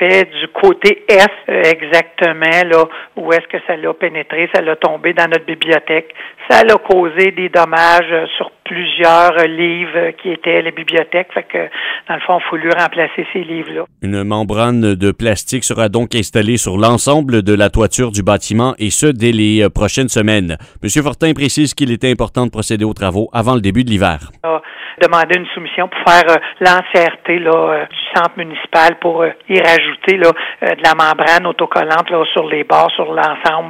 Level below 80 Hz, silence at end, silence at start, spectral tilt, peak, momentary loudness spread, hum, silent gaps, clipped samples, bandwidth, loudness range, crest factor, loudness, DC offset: -36 dBFS; 0 s; 0 s; -4.5 dB/octave; 0 dBFS; 10 LU; none; none; 0.3%; 16 kHz; 4 LU; 12 dB; -12 LUFS; under 0.1%